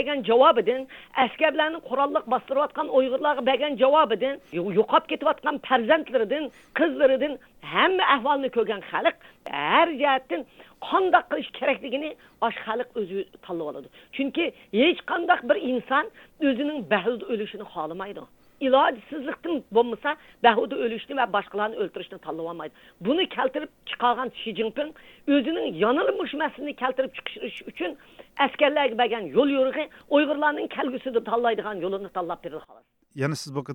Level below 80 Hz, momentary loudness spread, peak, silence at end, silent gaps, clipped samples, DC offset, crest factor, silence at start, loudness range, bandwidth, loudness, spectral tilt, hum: -64 dBFS; 13 LU; -4 dBFS; 0 s; none; under 0.1%; under 0.1%; 20 dB; 0 s; 5 LU; 18.5 kHz; -25 LUFS; -5.5 dB/octave; none